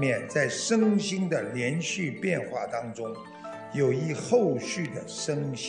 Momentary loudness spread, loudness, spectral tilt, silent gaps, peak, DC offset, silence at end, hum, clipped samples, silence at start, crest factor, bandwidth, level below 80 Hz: 12 LU; -28 LUFS; -5 dB/octave; none; -12 dBFS; under 0.1%; 0 s; none; under 0.1%; 0 s; 16 dB; 10 kHz; -74 dBFS